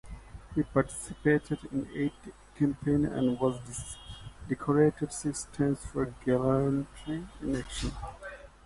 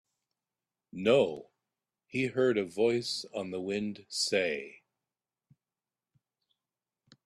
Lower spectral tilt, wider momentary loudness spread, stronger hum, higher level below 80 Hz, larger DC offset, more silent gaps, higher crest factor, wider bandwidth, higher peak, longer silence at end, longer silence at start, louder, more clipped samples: first, -6.5 dB/octave vs -4 dB/octave; first, 16 LU vs 12 LU; neither; first, -48 dBFS vs -74 dBFS; neither; neither; about the same, 20 dB vs 20 dB; second, 11.5 kHz vs 13 kHz; first, -10 dBFS vs -14 dBFS; second, 0.2 s vs 2.55 s; second, 0.05 s vs 0.95 s; about the same, -31 LUFS vs -31 LUFS; neither